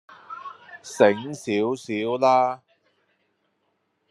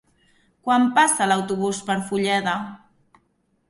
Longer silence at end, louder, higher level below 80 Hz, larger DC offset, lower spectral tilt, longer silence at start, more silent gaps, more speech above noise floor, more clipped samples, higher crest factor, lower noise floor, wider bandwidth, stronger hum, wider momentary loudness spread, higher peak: first, 1.55 s vs 0.95 s; about the same, -22 LUFS vs -21 LUFS; second, -78 dBFS vs -64 dBFS; neither; first, -5 dB/octave vs -3.5 dB/octave; second, 0.1 s vs 0.65 s; neither; about the same, 50 dB vs 47 dB; neither; about the same, 22 dB vs 18 dB; first, -72 dBFS vs -67 dBFS; about the same, 12.5 kHz vs 11.5 kHz; neither; first, 20 LU vs 11 LU; about the same, -2 dBFS vs -4 dBFS